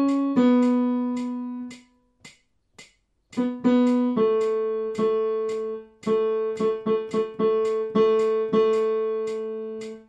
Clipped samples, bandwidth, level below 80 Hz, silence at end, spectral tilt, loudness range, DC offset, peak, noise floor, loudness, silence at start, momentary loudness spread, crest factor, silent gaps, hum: under 0.1%; 9.4 kHz; -68 dBFS; 0.05 s; -7 dB/octave; 4 LU; under 0.1%; -10 dBFS; -59 dBFS; -24 LUFS; 0 s; 12 LU; 14 dB; none; none